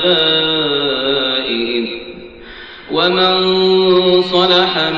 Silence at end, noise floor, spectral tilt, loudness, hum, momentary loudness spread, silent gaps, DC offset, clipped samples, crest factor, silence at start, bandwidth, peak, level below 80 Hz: 0 s; -34 dBFS; -6 dB/octave; -13 LUFS; none; 21 LU; none; 0.3%; under 0.1%; 12 dB; 0 s; 7.2 kHz; -2 dBFS; -48 dBFS